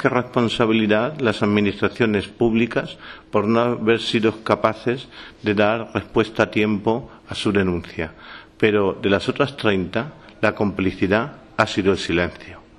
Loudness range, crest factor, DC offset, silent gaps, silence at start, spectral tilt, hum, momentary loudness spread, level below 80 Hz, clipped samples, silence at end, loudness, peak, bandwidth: 2 LU; 20 dB; under 0.1%; none; 0 s; -6 dB/octave; none; 10 LU; -48 dBFS; under 0.1%; 0.2 s; -21 LUFS; 0 dBFS; 11 kHz